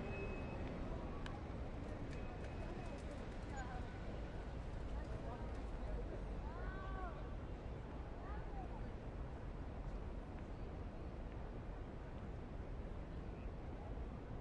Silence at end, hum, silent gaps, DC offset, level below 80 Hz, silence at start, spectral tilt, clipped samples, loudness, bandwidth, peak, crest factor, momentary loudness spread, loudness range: 0 s; none; none; under 0.1%; -50 dBFS; 0 s; -7.5 dB/octave; under 0.1%; -50 LUFS; 10 kHz; -32 dBFS; 16 dB; 3 LU; 2 LU